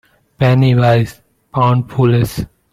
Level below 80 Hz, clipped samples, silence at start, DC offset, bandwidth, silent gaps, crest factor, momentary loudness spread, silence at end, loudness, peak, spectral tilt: -40 dBFS; under 0.1%; 0.4 s; under 0.1%; 14.5 kHz; none; 12 dB; 12 LU; 0.25 s; -14 LUFS; -2 dBFS; -7.5 dB/octave